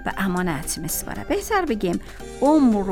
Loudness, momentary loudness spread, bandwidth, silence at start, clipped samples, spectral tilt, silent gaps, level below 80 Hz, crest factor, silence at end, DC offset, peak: -22 LUFS; 9 LU; 19 kHz; 0 s; under 0.1%; -5 dB/octave; none; -38 dBFS; 16 dB; 0 s; under 0.1%; -6 dBFS